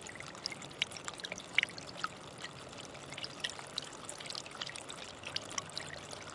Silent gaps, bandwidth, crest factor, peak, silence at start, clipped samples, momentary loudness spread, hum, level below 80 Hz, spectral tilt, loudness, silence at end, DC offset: none; 11.5 kHz; 30 dB; -12 dBFS; 0 s; under 0.1%; 12 LU; none; -72 dBFS; -1.5 dB/octave; -40 LUFS; 0 s; under 0.1%